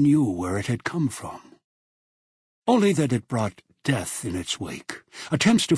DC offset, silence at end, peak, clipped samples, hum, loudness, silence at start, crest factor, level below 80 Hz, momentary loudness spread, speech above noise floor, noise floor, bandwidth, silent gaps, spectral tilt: under 0.1%; 0 s; -6 dBFS; under 0.1%; none; -25 LUFS; 0 s; 18 dB; -56 dBFS; 16 LU; over 67 dB; under -90 dBFS; 11 kHz; 1.64-2.62 s; -5 dB/octave